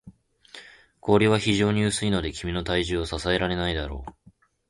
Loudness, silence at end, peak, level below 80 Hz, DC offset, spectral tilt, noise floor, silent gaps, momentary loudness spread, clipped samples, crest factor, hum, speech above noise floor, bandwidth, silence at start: -24 LUFS; 0.6 s; -6 dBFS; -40 dBFS; under 0.1%; -5 dB/octave; -58 dBFS; none; 20 LU; under 0.1%; 20 dB; none; 34 dB; 11.5 kHz; 0.05 s